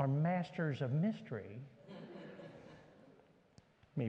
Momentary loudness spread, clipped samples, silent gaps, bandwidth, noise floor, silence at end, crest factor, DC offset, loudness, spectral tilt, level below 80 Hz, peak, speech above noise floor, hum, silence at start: 20 LU; under 0.1%; none; 7.6 kHz; -67 dBFS; 0 s; 18 dB; under 0.1%; -39 LUFS; -9 dB/octave; -80 dBFS; -22 dBFS; 28 dB; none; 0 s